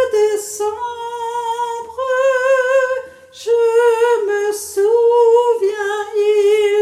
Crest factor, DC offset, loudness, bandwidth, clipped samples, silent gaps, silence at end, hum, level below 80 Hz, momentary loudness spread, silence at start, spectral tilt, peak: 12 dB; under 0.1%; -16 LUFS; 15 kHz; under 0.1%; none; 0 s; none; -64 dBFS; 11 LU; 0 s; -1.5 dB/octave; -4 dBFS